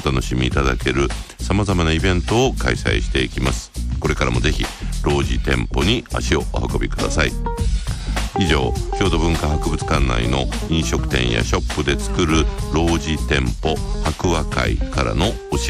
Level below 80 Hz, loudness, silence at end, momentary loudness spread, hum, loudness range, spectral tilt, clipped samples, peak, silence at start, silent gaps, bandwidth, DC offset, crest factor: -24 dBFS; -20 LUFS; 0 s; 5 LU; none; 1 LU; -5 dB/octave; under 0.1%; -4 dBFS; 0 s; none; 14 kHz; under 0.1%; 14 dB